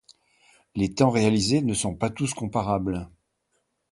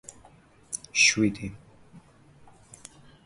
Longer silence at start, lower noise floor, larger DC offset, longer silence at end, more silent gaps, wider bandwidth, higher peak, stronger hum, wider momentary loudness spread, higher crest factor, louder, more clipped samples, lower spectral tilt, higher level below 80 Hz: about the same, 0.75 s vs 0.7 s; first, -74 dBFS vs -56 dBFS; neither; second, 0.85 s vs 1.25 s; neither; about the same, 11.5 kHz vs 11.5 kHz; about the same, -6 dBFS vs -8 dBFS; neither; second, 11 LU vs 28 LU; about the same, 20 dB vs 24 dB; about the same, -25 LUFS vs -23 LUFS; neither; first, -5.5 dB/octave vs -2 dB/octave; first, -50 dBFS vs -58 dBFS